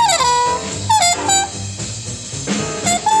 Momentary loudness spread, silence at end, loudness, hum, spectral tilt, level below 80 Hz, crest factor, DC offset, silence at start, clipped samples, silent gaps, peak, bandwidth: 12 LU; 0 s; -16 LUFS; none; -2 dB/octave; -44 dBFS; 14 dB; under 0.1%; 0 s; under 0.1%; none; -4 dBFS; 16 kHz